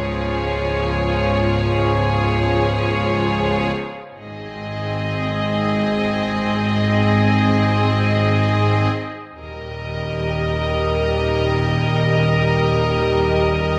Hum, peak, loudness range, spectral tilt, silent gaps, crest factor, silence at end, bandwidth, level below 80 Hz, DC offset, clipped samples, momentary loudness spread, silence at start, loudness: none; -4 dBFS; 4 LU; -7.5 dB/octave; none; 14 dB; 0 s; 8.2 kHz; -32 dBFS; under 0.1%; under 0.1%; 11 LU; 0 s; -19 LUFS